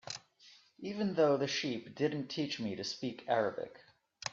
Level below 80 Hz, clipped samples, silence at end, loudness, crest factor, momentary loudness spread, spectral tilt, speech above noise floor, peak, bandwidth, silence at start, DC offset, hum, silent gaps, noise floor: -78 dBFS; under 0.1%; 0 s; -35 LUFS; 18 dB; 15 LU; -4.5 dB/octave; 28 dB; -18 dBFS; 7.8 kHz; 0.05 s; under 0.1%; none; none; -63 dBFS